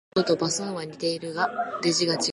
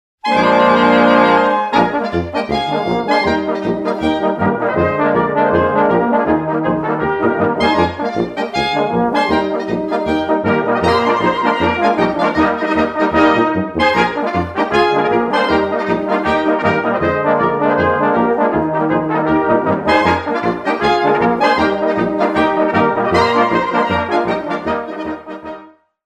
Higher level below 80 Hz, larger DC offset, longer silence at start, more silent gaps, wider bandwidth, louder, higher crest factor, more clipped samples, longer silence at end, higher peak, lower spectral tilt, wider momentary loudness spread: second, -66 dBFS vs -42 dBFS; neither; about the same, 0.15 s vs 0.25 s; neither; about the same, 11.5 kHz vs 10.5 kHz; second, -26 LUFS vs -15 LUFS; about the same, 16 dB vs 14 dB; neither; second, 0 s vs 0.4 s; second, -10 dBFS vs 0 dBFS; second, -3.5 dB/octave vs -6.5 dB/octave; about the same, 6 LU vs 6 LU